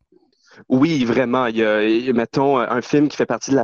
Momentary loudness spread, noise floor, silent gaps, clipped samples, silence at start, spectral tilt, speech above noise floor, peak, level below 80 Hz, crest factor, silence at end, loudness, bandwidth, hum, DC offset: 3 LU; -57 dBFS; none; under 0.1%; 0.7 s; -6 dB/octave; 40 dB; -4 dBFS; -58 dBFS; 14 dB; 0 s; -18 LUFS; 7.4 kHz; none; under 0.1%